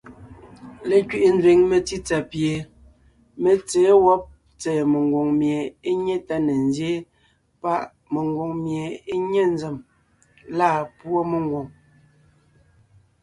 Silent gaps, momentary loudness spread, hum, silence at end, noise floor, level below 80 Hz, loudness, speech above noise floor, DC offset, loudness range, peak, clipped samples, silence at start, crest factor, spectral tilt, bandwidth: none; 14 LU; none; 1.5 s; -62 dBFS; -54 dBFS; -21 LUFS; 42 dB; under 0.1%; 6 LU; -4 dBFS; under 0.1%; 0.05 s; 18 dB; -6 dB/octave; 11.5 kHz